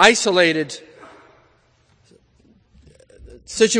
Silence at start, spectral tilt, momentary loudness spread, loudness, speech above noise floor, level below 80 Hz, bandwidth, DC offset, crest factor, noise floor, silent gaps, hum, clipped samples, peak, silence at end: 0 s; -2.5 dB/octave; 18 LU; -17 LUFS; 42 dB; -54 dBFS; 11 kHz; under 0.1%; 22 dB; -58 dBFS; none; none; under 0.1%; 0 dBFS; 0 s